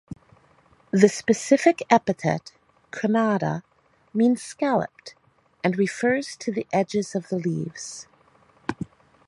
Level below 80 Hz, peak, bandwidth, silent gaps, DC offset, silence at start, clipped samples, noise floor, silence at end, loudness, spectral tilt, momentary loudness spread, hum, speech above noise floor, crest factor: -62 dBFS; -2 dBFS; 11.5 kHz; none; under 0.1%; 0.1 s; under 0.1%; -58 dBFS; 0.4 s; -24 LUFS; -5.5 dB/octave; 18 LU; none; 36 dB; 24 dB